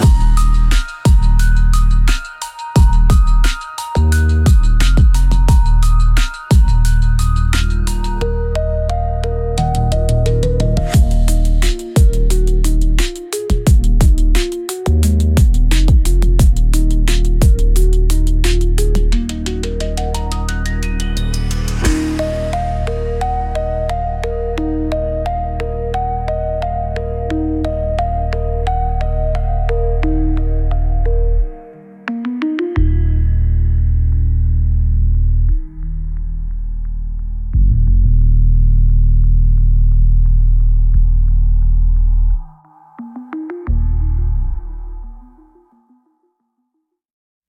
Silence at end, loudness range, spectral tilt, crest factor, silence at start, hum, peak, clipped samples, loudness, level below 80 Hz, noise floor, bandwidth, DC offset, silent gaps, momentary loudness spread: 2.3 s; 6 LU; -6 dB/octave; 10 dB; 0 s; none; -2 dBFS; under 0.1%; -16 LUFS; -14 dBFS; -71 dBFS; 13.5 kHz; under 0.1%; none; 9 LU